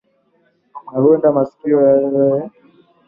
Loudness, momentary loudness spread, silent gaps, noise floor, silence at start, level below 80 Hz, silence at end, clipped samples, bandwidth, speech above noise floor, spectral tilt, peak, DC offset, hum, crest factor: -15 LUFS; 10 LU; none; -60 dBFS; 0.75 s; -60 dBFS; 0.6 s; under 0.1%; 2.6 kHz; 46 dB; -12.5 dB/octave; -2 dBFS; under 0.1%; none; 14 dB